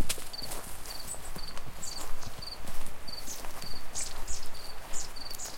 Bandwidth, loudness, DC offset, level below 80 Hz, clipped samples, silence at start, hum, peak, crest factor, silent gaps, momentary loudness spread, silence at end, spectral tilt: 17 kHz; -40 LUFS; under 0.1%; -42 dBFS; under 0.1%; 0 s; none; -14 dBFS; 14 dB; none; 6 LU; 0 s; -1.5 dB/octave